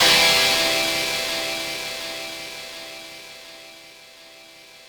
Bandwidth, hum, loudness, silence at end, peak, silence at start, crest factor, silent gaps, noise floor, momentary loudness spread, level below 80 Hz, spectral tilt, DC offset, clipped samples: over 20 kHz; none; -20 LUFS; 0.05 s; -4 dBFS; 0 s; 20 dB; none; -46 dBFS; 25 LU; -54 dBFS; -0.5 dB/octave; under 0.1%; under 0.1%